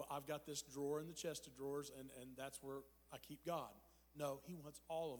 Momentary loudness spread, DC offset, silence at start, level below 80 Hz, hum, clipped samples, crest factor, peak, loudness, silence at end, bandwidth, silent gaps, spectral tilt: 11 LU; under 0.1%; 0 s; -76 dBFS; none; under 0.1%; 18 dB; -32 dBFS; -50 LUFS; 0 s; over 20 kHz; none; -4 dB/octave